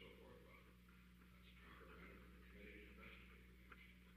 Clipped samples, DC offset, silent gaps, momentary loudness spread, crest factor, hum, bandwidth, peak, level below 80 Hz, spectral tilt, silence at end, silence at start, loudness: under 0.1%; under 0.1%; none; 7 LU; 16 dB; 60 Hz at -65 dBFS; 15 kHz; -46 dBFS; -68 dBFS; -5.5 dB/octave; 0 s; 0 s; -63 LUFS